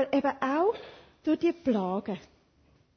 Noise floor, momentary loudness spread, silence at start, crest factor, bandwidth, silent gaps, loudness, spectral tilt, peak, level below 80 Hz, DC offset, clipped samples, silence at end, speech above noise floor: -65 dBFS; 13 LU; 0 s; 16 dB; 6.6 kHz; none; -29 LUFS; -7.5 dB/octave; -14 dBFS; -66 dBFS; under 0.1%; under 0.1%; 0.8 s; 36 dB